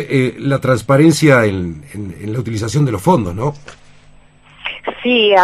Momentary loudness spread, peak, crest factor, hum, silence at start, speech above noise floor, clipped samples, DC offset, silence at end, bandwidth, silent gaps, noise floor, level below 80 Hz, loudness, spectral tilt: 16 LU; 0 dBFS; 14 dB; 50 Hz at -35 dBFS; 0 s; 30 dB; under 0.1%; under 0.1%; 0 s; 14.5 kHz; none; -44 dBFS; -46 dBFS; -15 LUFS; -6 dB/octave